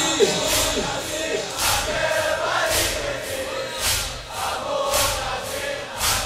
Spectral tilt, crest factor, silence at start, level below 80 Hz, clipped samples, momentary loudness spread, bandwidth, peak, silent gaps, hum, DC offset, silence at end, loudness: -1.5 dB/octave; 18 dB; 0 s; -40 dBFS; under 0.1%; 8 LU; 16 kHz; -4 dBFS; none; none; under 0.1%; 0 s; -22 LUFS